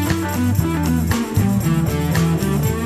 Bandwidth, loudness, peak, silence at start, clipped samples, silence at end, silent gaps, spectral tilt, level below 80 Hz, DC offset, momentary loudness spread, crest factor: 15 kHz; -19 LUFS; -4 dBFS; 0 s; under 0.1%; 0 s; none; -6 dB/octave; -32 dBFS; 0.3%; 2 LU; 14 dB